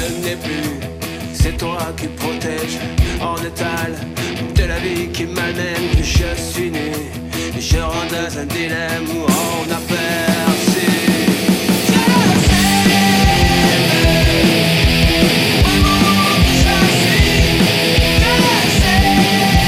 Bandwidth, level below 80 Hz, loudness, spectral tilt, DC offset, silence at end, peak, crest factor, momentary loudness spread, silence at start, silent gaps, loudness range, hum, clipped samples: 16 kHz; -22 dBFS; -14 LUFS; -4.5 dB/octave; under 0.1%; 0 s; 0 dBFS; 14 dB; 10 LU; 0 s; none; 9 LU; none; under 0.1%